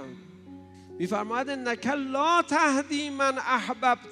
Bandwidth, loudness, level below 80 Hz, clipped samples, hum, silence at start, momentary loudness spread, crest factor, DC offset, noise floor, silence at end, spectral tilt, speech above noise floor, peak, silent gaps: 12.5 kHz; -26 LUFS; -76 dBFS; under 0.1%; none; 0 s; 8 LU; 18 dB; under 0.1%; -47 dBFS; 0 s; -3.5 dB/octave; 21 dB; -10 dBFS; none